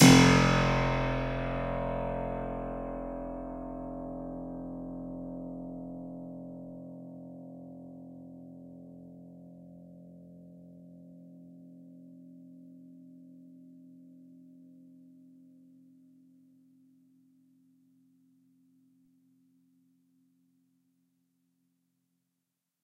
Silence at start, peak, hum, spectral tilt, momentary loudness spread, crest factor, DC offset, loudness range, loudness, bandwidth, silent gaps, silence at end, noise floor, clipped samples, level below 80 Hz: 0 s; -6 dBFS; none; -5 dB/octave; 24 LU; 28 dB; under 0.1%; 22 LU; -31 LUFS; 15.5 kHz; none; 8.95 s; -85 dBFS; under 0.1%; -48 dBFS